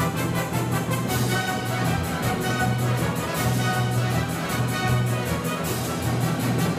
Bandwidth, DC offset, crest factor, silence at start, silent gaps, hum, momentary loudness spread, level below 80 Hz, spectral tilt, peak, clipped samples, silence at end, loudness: 15.5 kHz; under 0.1%; 14 dB; 0 s; none; none; 3 LU; -44 dBFS; -5 dB/octave; -10 dBFS; under 0.1%; 0 s; -24 LUFS